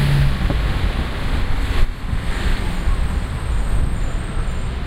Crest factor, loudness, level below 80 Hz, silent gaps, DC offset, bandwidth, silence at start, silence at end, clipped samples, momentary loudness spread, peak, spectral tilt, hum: 14 dB; -23 LUFS; -20 dBFS; none; under 0.1%; 14.5 kHz; 0 s; 0 s; under 0.1%; 6 LU; -4 dBFS; -6 dB/octave; none